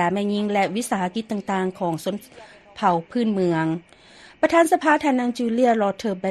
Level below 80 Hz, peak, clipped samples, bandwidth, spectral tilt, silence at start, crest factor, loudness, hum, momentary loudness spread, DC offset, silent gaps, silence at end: -62 dBFS; -4 dBFS; under 0.1%; 13 kHz; -5.5 dB/octave; 0 s; 18 dB; -22 LUFS; none; 9 LU; under 0.1%; none; 0 s